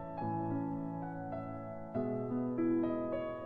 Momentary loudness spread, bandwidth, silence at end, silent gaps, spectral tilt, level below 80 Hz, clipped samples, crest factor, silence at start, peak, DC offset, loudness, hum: 9 LU; 4.5 kHz; 0 s; none; -11 dB/octave; -62 dBFS; under 0.1%; 12 dB; 0 s; -24 dBFS; under 0.1%; -38 LUFS; none